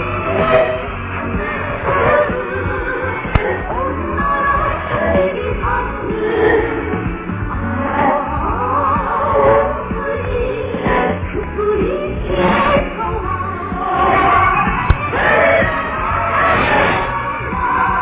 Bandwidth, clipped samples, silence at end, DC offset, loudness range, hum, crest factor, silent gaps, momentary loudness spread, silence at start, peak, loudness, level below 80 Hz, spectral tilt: 4 kHz; under 0.1%; 0 s; under 0.1%; 4 LU; none; 16 dB; none; 8 LU; 0 s; 0 dBFS; -16 LUFS; -28 dBFS; -10 dB/octave